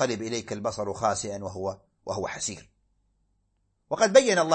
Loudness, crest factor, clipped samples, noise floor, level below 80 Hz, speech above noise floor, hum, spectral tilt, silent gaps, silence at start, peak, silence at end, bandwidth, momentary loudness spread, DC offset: -27 LUFS; 24 dB; under 0.1%; -73 dBFS; -62 dBFS; 47 dB; none; -3.5 dB/octave; none; 0 s; -4 dBFS; 0 s; 8.8 kHz; 16 LU; under 0.1%